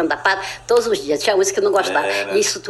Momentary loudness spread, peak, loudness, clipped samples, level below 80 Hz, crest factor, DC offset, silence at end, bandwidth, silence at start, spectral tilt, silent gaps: 2 LU; -2 dBFS; -18 LUFS; under 0.1%; -54 dBFS; 16 dB; under 0.1%; 0 s; 14.5 kHz; 0 s; -2 dB/octave; none